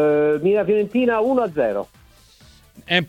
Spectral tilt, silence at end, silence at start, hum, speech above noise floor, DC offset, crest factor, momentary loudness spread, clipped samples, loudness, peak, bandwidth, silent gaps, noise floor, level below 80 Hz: -6.5 dB/octave; 0 s; 0 s; none; 31 dB; under 0.1%; 18 dB; 6 LU; under 0.1%; -19 LUFS; -2 dBFS; 10 kHz; none; -50 dBFS; -54 dBFS